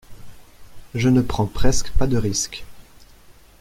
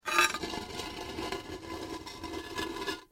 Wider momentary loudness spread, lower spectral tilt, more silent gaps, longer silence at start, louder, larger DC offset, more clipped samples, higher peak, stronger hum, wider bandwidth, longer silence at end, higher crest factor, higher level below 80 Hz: second, 10 LU vs 14 LU; first, -5 dB/octave vs -2.5 dB/octave; neither; about the same, 0.1 s vs 0.05 s; first, -22 LUFS vs -35 LUFS; neither; neither; first, -2 dBFS vs -10 dBFS; neither; about the same, 15 kHz vs 16.5 kHz; first, 0.8 s vs 0.1 s; second, 18 dB vs 26 dB; first, -30 dBFS vs -56 dBFS